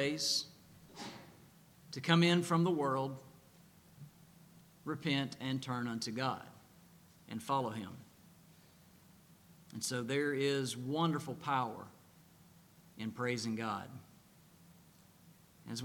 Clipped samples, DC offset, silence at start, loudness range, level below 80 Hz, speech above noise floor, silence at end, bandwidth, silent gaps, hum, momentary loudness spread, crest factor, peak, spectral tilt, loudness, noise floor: under 0.1%; under 0.1%; 0 s; 8 LU; -78 dBFS; 27 dB; 0 s; 19 kHz; none; none; 23 LU; 26 dB; -12 dBFS; -4.5 dB/octave; -36 LUFS; -63 dBFS